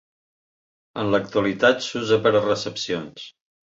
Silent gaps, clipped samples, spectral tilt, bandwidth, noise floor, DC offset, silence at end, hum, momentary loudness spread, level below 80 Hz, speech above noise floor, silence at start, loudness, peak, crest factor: none; under 0.1%; -4.5 dB/octave; 7.8 kHz; under -90 dBFS; under 0.1%; 0.4 s; none; 18 LU; -60 dBFS; over 68 dB; 0.95 s; -22 LUFS; -4 dBFS; 20 dB